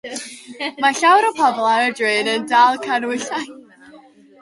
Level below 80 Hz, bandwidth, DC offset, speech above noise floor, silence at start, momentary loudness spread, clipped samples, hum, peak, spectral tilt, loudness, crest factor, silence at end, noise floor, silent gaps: -72 dBFS; 11.5 kHz; under 0.1%; 28 dB; 0.05 s; 15 LU; under 0.1%; none; -2 dBFS; -2 dB/octave; -17 LUFS; 16 dB; 0.45 s; -46 dBFS; none